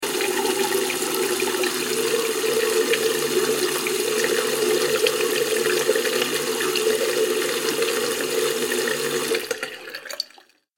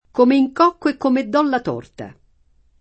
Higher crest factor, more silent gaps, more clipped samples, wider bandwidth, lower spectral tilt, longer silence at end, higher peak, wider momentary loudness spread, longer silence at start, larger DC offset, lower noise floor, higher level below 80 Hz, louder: about the same, 20 dB vs 18 dB; neither; neither; first, 17 kHz vs 8.4 kHz; second, -1.5 dB/octave vs -6.5 dB/octave; second, 0.55 s vs 0.7 s; about the same, -2 dBFS vs -2 dBFS; second, 4 LU vs 21 LU; second, 0 s vs 0.15 s; neither; about the same, -53 dBFS vs -56 dBFS; second, -70 dBFS vs -56 dBFS; second, -22 LUFS vs -17 LUFS